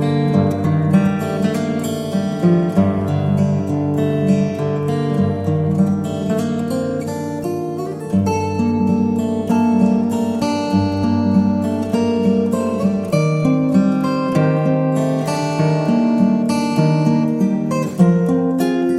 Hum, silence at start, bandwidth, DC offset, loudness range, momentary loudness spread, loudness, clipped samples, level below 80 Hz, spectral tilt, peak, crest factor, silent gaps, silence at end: none; 0 s; 13.5 kHz; under 0.1%; 3 LU; 5 LU; -17 LUFS; under 0.1%; -50 dBFS; -8 dB/octave; -2 dBFS; 14 dB; none; 0 s